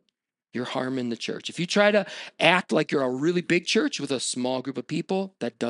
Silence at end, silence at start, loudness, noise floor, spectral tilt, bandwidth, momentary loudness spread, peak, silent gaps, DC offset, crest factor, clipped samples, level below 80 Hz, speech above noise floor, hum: 0 s; 0.55 s; -25 LUFS; -78 dBFS; -4 dB/octave; 11.5 kHz; 11 LU; -2 dBFS; none; under 0.1%; 24 dB; under 0.1%; -78 dBFS; 53 dB; none